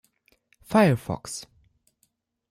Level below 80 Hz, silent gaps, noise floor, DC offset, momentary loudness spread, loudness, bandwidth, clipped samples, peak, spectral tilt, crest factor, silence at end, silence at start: -58 dBFS; none; -72 dBFS; under 0.1%; 16 LU; -24 LUFS; 15.5 kHz; under 0.1%; -8 dBFS; -6 dB/octave; 20 dB; 1.1 s; 0.7 s